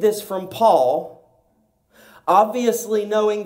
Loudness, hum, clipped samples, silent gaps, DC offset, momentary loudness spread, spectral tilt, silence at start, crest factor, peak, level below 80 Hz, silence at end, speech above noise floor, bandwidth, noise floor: -19 LUFS; none; under 0.1%; none; under 0.1%; 12 LU; -4.5 dB/octave; 0 s; 16 dB; -4 dBFS; -68 dBFS; 0 s; 45 dB; 16.5 kHz; -63 dBFS